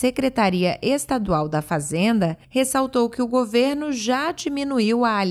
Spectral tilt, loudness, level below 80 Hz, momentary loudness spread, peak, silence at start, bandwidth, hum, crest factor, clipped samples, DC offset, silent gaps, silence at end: -5 dB/octave; -21 LUFS; -50 dBFS; 4 LU; -8 dBFS; 0 s; 14.5 kHz; none; 14 dB; under 0.1%; under 0.1%; none; 0 s